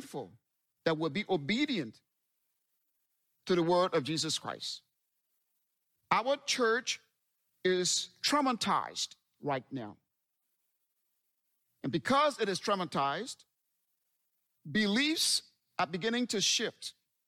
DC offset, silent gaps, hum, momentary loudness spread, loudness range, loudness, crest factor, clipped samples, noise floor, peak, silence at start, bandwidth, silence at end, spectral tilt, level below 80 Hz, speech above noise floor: under 0.1%; none; none; 15 LU; 5 LU; -31 LUFS; 22 dB; under 0.1%; -83 dBFS; -12 dBFS; 0 s; 16.5 kHz; 0.35 s; -3 dB/octave; -76 dBFS; 51 dB